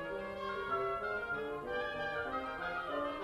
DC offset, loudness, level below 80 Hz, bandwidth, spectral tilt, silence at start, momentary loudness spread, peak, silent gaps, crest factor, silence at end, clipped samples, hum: under 0.1%; -38 LUFS; -60 dBFS; 13 kHz; -5.5 dB/octave; 0 s; 4 LU; -24 dBFS; none; 14 dB; 0 s; under 0.1%; none